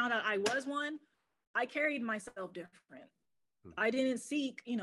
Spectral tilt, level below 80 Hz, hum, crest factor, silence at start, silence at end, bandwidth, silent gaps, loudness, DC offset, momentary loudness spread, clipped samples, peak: -3.5 dB/octave; -82 dBFS; none; 20 dB; 0 s; 0 s; 12.5 kHz; 1.47-1.54 s; -36 LUFS; under 0.1%; 15 LU; under 0.1%; -18 dBFS